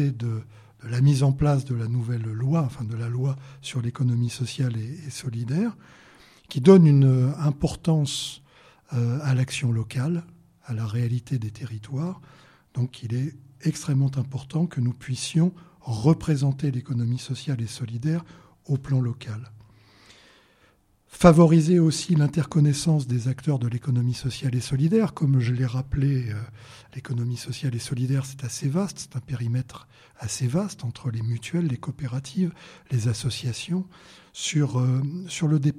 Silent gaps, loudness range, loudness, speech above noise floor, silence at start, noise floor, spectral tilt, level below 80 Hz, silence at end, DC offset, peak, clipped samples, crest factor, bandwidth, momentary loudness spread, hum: none; 8 LU; -25 LUFS; 38 dB; 0 s; -61 dBFS; -7 dB/octave; -52 dBFS; 0 s; under 0.1%; 0 dBFS; under 0.1%; 24 dB; 13.5 kHz; 13 LU; none